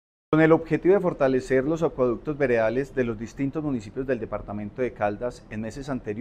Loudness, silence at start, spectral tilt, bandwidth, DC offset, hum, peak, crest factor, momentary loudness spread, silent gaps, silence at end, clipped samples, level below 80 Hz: -25 LUFS; 0.3 s; -7.5 dB/octave; 9.6 kHz; under 0.1%; none; -4 dBFS; 20 dB; 12 LU; none; 0 s; under 0.1%; -48 dBFS